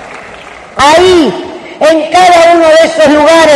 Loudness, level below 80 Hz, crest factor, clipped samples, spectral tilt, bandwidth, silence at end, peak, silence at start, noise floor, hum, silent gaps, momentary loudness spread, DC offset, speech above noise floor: -5 LUFS; -38 dBFS; 6 dB; 2%; -3.5 dB/octave; 12 kHz; 0 s; 0 dBFS; 0 s; -28 dBFS; none; none; 19 LU; under 0.1%; 24 dB